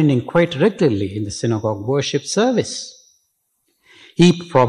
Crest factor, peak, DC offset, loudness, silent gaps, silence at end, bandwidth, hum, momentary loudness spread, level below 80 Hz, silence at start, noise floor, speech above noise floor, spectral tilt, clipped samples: 14 dB; -4 dBFS; under 0.1%; -18 LUFS; none; 0 s; 11 kHz; none; 11 LU; -50 dBFS; 0 s; -68 dBFS; 51 dB; -5.5 dB/octave; under 0.1%